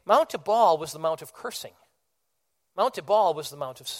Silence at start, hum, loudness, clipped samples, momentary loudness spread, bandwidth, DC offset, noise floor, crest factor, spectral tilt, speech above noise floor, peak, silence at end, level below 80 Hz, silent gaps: 0.05 s; none; -25 LUFS; under 0.1%; 15 LU; 16.5 kHz; under 0.1%; -79 dBFS; 20 dB; -3.5 dB/octave; 54 dB; -6 dBFS; 0 s; -72 dBFS; none